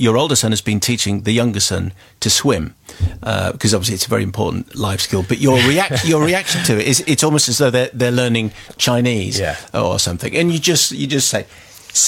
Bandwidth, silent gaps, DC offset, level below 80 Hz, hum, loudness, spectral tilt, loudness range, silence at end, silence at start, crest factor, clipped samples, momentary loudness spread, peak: 17 kHz; none; under 0.1%; -42 dBFS; none; -16 LUFS; -3.5 dB/octave; 3 LU; 0 s; 0 s; 16 dB; under 0.1%; 8 LU; 0 dBFS